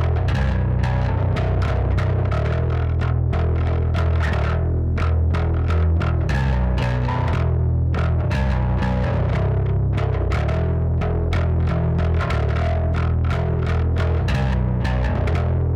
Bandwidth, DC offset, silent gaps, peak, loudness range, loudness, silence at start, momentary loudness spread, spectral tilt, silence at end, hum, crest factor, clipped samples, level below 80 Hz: 7 kHz; under 0.1%; none; -8 dBFS; 0 LU; -21 LUFS; 0 s; 1 LU; -8.5 dB/octave; 0 s; none; 10 dB; under 0.1%; -24 dBFS